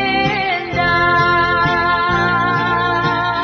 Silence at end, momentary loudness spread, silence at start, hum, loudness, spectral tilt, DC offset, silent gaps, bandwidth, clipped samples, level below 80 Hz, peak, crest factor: 0 s; 4 LU; 0 s; none; -15 LUFS; -6 dB/octave; under 0.1%; none; 6.6 kHz; under 0.1%; -38 dBFS; -4 dBFS; 12 dB